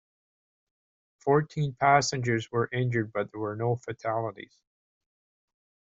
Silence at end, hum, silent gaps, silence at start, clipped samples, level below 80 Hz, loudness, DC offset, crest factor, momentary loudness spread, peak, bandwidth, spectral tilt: 1.55 s; none; none; 1.25 s; under 0.1%; -64 dBFS; -28 LUFS; under 0.1%; 22 dB; 11 LU; -6 dBFS; 8 kHz; -5 dB/octave